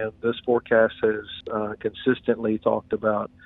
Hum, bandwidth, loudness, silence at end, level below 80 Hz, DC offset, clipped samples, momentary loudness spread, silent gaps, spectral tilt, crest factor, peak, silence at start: none; 4.1 kHz; -24 LUFS; 0.2 s; -58 dBFS; under 0.1%; under 0.1%; 9 LU; none; -9 dB/octave; 18 dB; -6 dBFS; 0 s